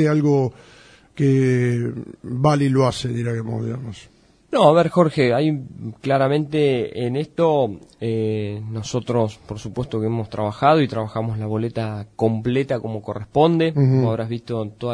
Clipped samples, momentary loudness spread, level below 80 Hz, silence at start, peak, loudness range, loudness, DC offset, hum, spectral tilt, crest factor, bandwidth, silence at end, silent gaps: under 0.1%; 12 LU; -52 dBFS; 0 s; -2 dBFS; 4 LU; -21 LUFS; under 0.1%; none; -7.5 dB/octave; 18 dB; 10.5 kHz; 0 s; none